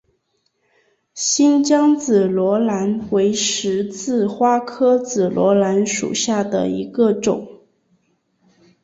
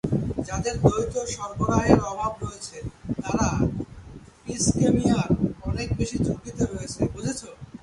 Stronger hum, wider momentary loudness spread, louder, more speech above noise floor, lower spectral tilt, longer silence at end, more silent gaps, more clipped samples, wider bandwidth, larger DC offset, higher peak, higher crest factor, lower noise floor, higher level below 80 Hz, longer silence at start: neither; second, 7 LU vs 15 LU; first, -17 LUFS vs -25 LUFS; first, 51 dB vs 20 dB; second, -4.5 dB/octave vs -6 dB/octave; first, 1.25 s vs 0.05 s; neither; neither; second, 8 kHz vs 11.5 kHz; neither; second, -4 dBFS vs 0 dBFS; second, 14 dB vs 24 dB; first, -68 dBFS vs -44 dBFS; second, -60 dBFS vs -38 dBFS; first, 1.15 s vs 0.05 s